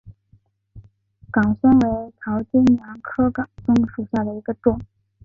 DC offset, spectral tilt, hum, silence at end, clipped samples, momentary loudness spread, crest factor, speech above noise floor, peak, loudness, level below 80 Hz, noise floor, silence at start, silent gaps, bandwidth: under 0.1%; -8.5 dB/octave; none; 0.4 s; under 0.1%; 11 LU; 16 dB; 39 dB; -4 dBFS; -20 LUFS; -44 dBFS; -58 dBFS; 0.05 s; none; 6.8 kHz